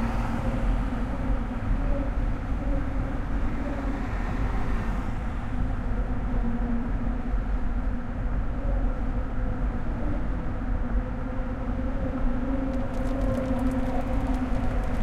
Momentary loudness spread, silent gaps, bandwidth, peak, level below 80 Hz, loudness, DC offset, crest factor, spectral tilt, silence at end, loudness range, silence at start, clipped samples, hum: 3 LU; none; 7.4 kHz; -14 dBFS; -28 dBFS; -30 LUFS; under 0.1%; 12 dB; -8.5 dB/octave; 0 s; 2 LU; 0 s; under 0.1%; none